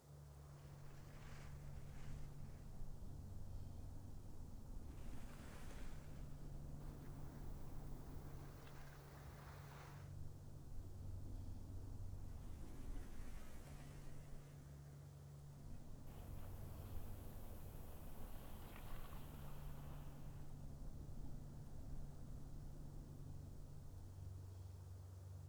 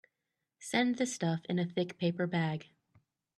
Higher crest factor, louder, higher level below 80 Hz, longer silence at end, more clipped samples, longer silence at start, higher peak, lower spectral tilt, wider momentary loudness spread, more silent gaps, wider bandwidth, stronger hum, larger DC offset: second, 14 dB vs 20 dB; second, -57 LUFS vs -34 LUFS; first, -56 dBFS vs -78 dBFS; second, 0 s vs 0.75 s; neither; second, 0 s vs 0.6 s; second, -36 dBFS vs -16 dBFS; about the same, -6.5 dB/octave vs -5.5 dB/octave; about the same, 4 LU vs 5 LU; neither; first, over 20 kHz vs 12.5 kHz; neither; neither